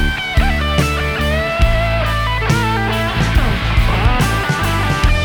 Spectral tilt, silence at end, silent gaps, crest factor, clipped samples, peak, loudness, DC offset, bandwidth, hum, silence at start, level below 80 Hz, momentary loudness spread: -5 dB/octave; 0 s; none; 14 dB; under 0.1%; 0 dBFS; -16 LUFS; under 0.1%; 19.5 kHz; none; 0 s; -18 dBFS; 2 LU